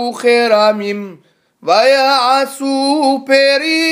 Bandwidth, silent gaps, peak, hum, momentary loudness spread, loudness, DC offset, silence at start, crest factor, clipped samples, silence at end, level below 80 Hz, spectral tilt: 16 kHz; none; 0 dBFS; none; 11 LU; -12 LUFS; under 0.1%; 0 s; 12 dB; under 0.1%; 0 s; -70 dBFS; -3 dB/octave